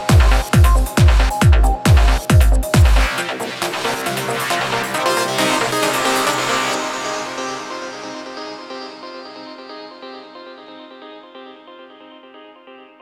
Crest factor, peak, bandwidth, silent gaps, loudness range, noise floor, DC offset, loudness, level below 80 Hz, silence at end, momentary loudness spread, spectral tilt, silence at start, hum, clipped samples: 16 dB; 0 dBFS; 16 kHz; none; 21 LU; -42 dBFS; under 0.1%; -16 LUFS; -20 dBFS; 0.25 s; 22 LU; -4.5 dB/octave; 0 s; none; under 0.1%